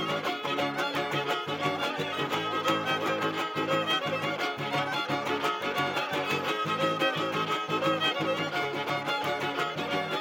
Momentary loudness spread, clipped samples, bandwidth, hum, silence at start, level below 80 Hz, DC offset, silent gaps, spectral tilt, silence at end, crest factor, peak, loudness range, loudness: 4 LU; under 0.1%; 17 kHz; none; 0 s; -74 dBFS; under 0.1%; none; -4 dB/octave; 0 s; 16 dB; -14 dBFS; 1 LU; -29 LUFS